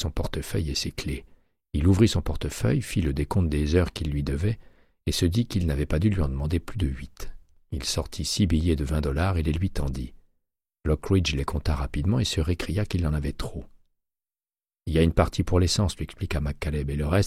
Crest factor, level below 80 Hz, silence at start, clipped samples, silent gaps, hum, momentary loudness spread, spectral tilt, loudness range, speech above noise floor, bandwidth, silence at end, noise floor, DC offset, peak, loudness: 18 dB; -34 dBFS; 0 s; under 0.1%; none; none; 11 LU; -6 dB/octave; 3 LU; over 65 dB; 15 kHz; 0 s; under -90 dBFS; under 0.1%; -8 dBFS; -26 LUFS